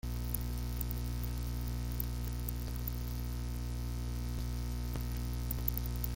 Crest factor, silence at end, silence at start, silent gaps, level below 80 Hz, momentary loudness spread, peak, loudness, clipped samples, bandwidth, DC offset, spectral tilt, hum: 24 dB; 0 s; 0.05 s; none; -38 dBFS; 4 LU; -12 dBFS; -39 LUFS; under 0.1%; 17 kHz; under 0.1%; -5.5 dB/octave; 60 Hz at -40 dBFS